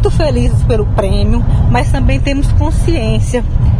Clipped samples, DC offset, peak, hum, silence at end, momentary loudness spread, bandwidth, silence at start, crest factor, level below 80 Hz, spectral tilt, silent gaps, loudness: under 0.1%; under 0.1%; 0 dBFS; none; 0 s; 2 LU; 11 kHz; 0 s; 10 dB; -14 dBFS; -7 dB/octave; none; -13 LUFS